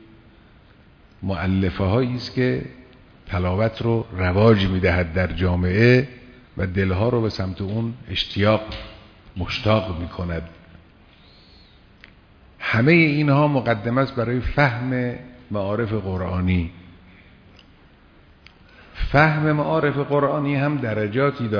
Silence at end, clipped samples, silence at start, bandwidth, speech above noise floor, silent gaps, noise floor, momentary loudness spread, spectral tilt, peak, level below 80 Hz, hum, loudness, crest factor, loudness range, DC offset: 0 s; under 0.1%; 1.2 s; 5.4 kHz; 31 dB; none; -51 dBFS; 13 LU; -8 dB/octave; -2 dBFS; -40 dBFS; none; -21 LUFS; 18 dB; 8 LU; under 0.1%